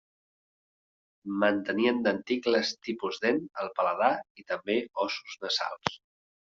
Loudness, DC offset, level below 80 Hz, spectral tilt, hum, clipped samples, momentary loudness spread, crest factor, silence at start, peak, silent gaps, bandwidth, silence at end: -29 LUFS; under 0.1%; -72 dBFS; -2 dB/octave; none; under 0.1%; 9 LU; 26 dB; 1.25 s; -4 dBFS; 4.30-4.35 s; 7.6 kHz; 0.55 s